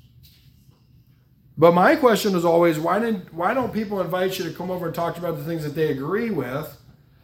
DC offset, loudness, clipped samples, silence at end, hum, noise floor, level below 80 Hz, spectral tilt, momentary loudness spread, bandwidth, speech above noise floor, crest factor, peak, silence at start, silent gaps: under 0.1%; -22 LUFS; under 0.1%; 0.45 s; none; -55 dBFS; -58 dBFS; -6 dB/octave; 12 LU; 17 kHz; 34 dB; 20 dB; -2 dBFS; 1.55 s; none